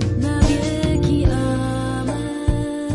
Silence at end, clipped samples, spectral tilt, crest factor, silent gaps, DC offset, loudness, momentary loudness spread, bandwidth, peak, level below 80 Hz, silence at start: 0 s; under 0.1%; -6.5 dB/octave; 18 dB; none; under 0.1%; -20 LUFS; 5 LU; 11.5 kHz; -2 dBFS; -26 dBFS; 0 s